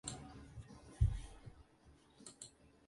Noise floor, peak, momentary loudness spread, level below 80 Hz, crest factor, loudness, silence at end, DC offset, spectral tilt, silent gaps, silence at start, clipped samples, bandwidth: -67 dBFS; -20 dBFS; 22 LU; -48 dBFS; 24 dB; -45 LUFS; 0.2 s; under 0.1%; -5 dB/octave; none; 0.05 s; under 0.1%; 11.5 kHz